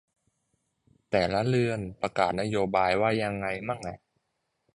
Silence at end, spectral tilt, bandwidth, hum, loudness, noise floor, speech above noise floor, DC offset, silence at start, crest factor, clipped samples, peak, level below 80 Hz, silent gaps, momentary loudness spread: 0.8 s; -6 dB/octave; 11.5 kHz; none; -28 LUFS; -79 dBFS; 52 dB; under 0.1%; 1.1 s; 20 dB; under 0.1%; -10 dBFS; -56 dBFS; none; 8 LU